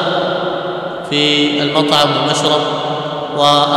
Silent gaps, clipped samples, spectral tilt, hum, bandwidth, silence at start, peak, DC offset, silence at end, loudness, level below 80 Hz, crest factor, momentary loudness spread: none; 0.2%; -4 dB/octave; none; 16 kHz; 0 s; 0 dBFS; under 0.1%; 0 s; -14 LUFS; -56 dBFS; 14 dB; 9 LU